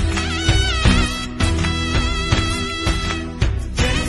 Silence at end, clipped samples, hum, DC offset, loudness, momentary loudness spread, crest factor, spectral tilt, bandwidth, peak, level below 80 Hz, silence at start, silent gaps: 0 s; under 0.1%; none; under 0.1%; -19 LUFS; 6 LU; 16 dB; -4.5 dB/octave; 12 kHz; -2 dBFS; -22 dBFS; 0 s; none